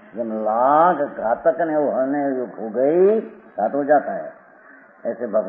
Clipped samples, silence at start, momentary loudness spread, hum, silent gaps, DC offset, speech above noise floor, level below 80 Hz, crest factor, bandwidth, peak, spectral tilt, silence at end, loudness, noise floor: under 0.1%; 0.15 s; 13 LU; none; none; under 0.1%; 28 dB; -68 dBFS; 16 dB; 3.5 kHz; -4 dBFS; -11.5 dB/octave; 0 s; -20 LUFS; -47 dBFS